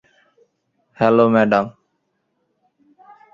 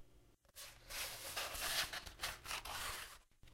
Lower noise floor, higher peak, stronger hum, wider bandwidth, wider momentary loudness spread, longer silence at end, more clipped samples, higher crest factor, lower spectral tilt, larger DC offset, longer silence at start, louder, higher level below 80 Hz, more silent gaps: about the same, -71 dBFS vs -68 dBFS; first, -2 dBFS vs -26 dBFS; neither; second, 7.2 kHz vs 16 kHz; second, 7 LU vs 16 LU; first, 1.65 s vs 0 s; neither; about the same, 20 dB vs 22 dB; first, -8 dB/octave vs 0 dB/octave; neither; first, 1 s vs 0 s; first, -16 LUFS vs -43 LUFS; about the same, -60 dBFS vs -62 dBFS; neither